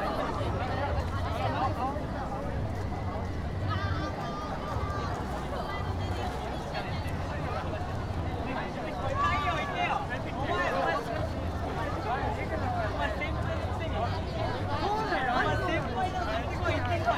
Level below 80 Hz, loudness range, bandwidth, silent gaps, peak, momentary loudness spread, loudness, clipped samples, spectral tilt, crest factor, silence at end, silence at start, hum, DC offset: -40 dBFS; 3 LU; 13.5 kHz; none; -16 dBFS; 6 LU; -32 LUFS; under 0.1%; -6.5 dB/octave; 16 dB; 0 s; 0 s; none; under 0.1%